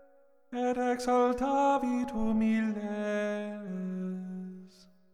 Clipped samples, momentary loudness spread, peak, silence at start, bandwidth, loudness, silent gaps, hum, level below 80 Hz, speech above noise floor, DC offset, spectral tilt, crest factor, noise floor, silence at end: under 0.1%; 14 LU; -16 dBFS; 0.5 s; 12 kHz; -31 LUFS; none; none; -54 dBFS; 34 dB; under 0.1%; -6.5 dB/octave; 14 dB; -63 dBFS; 0.45 s